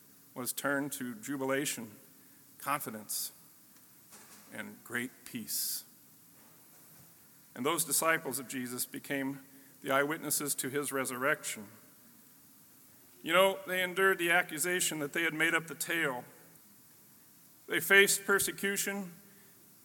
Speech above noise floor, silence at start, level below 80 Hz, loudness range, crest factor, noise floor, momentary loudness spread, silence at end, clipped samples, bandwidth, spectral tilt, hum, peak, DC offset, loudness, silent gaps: 27 dB; 0.35 s; -82 dBFS; 10 LU; 28 dB; -60 dBFS; 17 LU; 0.65 s; under 0.1%; 17.5 kHz; -2 dB/octave; none; -8 dBFS; under 0.1%; -32 LUFS; none